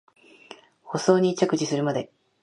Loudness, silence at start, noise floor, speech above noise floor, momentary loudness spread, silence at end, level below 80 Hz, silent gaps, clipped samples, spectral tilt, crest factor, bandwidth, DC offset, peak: -24 LUFS; 0.5 s; -49 dBFS; 26 dB; 12 LU; 0.35 s; -72 dBFS; none; under 0.1%; -5.5 dB/octave; 22 dB; 11.5 kHz; under 0.1%; -4 dBFS